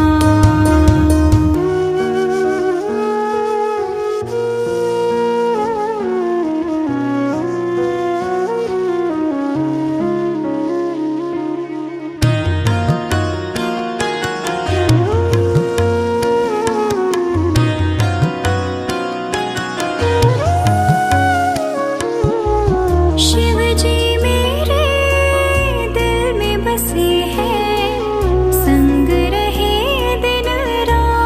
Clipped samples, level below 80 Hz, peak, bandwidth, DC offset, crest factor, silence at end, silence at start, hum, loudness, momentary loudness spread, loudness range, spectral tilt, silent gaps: under 0.1%; -24 dBFS; 0 dBFS; 15.5 kHz; under 0.1%; 14 dB; 0 s; 0 s; none; -16 LUFS; 7 LU; 4 LU; -6 dB/octave; none